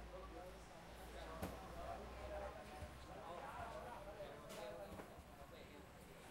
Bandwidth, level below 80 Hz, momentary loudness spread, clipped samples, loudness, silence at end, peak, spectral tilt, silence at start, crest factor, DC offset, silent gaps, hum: 16 kHz; -62 dBFS; 8 LU; under 0.1%; -54 LUFS; 0 s; -36 dBFS; -5 dB/octave; 0 s; 18 dB; under 0.1%; none; none